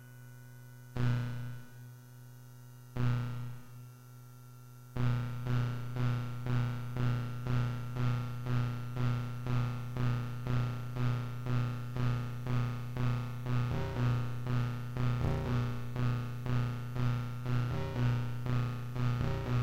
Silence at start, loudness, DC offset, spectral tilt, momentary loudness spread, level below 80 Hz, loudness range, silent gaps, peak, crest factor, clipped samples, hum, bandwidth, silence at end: 0 s; -35 LUFS; 0.1%; -7.5 dB/octave; 19 LU; -50 dBFS; 5 LU; none; -18 dBFS; 16 dB; under 0.1%; none; 13.5 kHz; 0 s